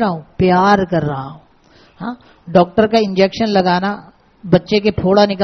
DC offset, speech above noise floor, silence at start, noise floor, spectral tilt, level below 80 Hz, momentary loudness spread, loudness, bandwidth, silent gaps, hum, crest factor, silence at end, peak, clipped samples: under 0.1%; 34 dB; 0 s; -48 dBFS; -5 dB/octave; -44 dBFS; 16 LU; -14 LUFS; 6.4 kHz; none; none; 16 dB; 0 s; 0 dBFS; under 0.1%